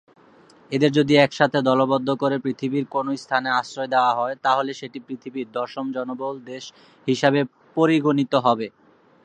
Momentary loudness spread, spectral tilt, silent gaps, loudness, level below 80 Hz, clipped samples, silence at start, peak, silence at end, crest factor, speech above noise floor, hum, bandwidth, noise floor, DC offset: 14 LU; -6 dB/octave; none; -22 LUFS; -68 dBFS; under 0.1%; 0.7 s; 0 dBFS; 0.55 s; 22 dB; 31 dB; none; 9.4 kHz; -52 dBFS; under 0.1%